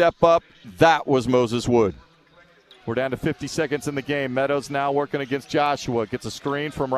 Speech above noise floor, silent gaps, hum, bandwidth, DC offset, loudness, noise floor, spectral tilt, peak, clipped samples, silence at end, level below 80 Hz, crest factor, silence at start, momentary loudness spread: 33 dB; none; none; 14 kHz; under 0.1%; -22 LUFS; -54 dBFS; -5.5 dB/octave; -2 dBFS; under 0.1%; 0 s; -50 dBFS; 20 dB; 0 s; 9 LU